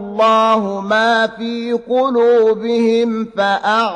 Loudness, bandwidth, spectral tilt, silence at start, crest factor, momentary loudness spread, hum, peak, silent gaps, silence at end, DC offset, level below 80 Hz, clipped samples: -15 LUFS; 9.6 kHz; -5 dB/octave; 0 s; 12 dB; 7 LU; none; -2 dBFS; none; 0 s; under 0.1%; -58 dBFS; under 0.1%